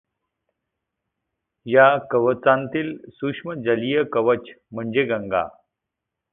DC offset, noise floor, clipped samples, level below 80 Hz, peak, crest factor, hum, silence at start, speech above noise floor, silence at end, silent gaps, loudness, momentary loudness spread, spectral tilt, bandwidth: under 0.1%; -83 dBFS; under 0.1%; -62 dBFS; -2 dBFS; 22 dB; none; 1.65 s; 63 dB; 0.8 s; none; -21 LUFS; 15 LU; -10.5 dB/octave; 3.9 kHz